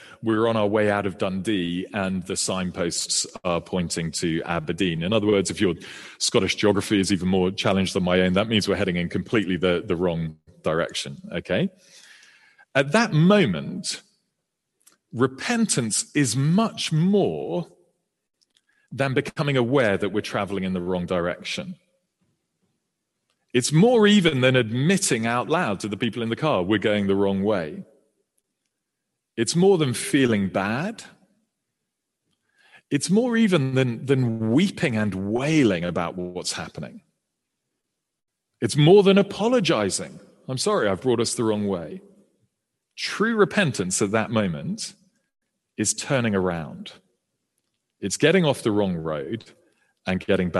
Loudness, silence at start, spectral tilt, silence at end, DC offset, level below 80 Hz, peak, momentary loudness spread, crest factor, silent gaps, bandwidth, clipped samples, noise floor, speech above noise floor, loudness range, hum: -23 LUFS; 0 s; -5 dB/octave; 0 s; under 0.1%; -58 dBFS; -4 dBFS; 12 LU; 20 dB; none; 12.5 kHz; under 0.1%; -81 dBFS; 59 dB; 5 LU; none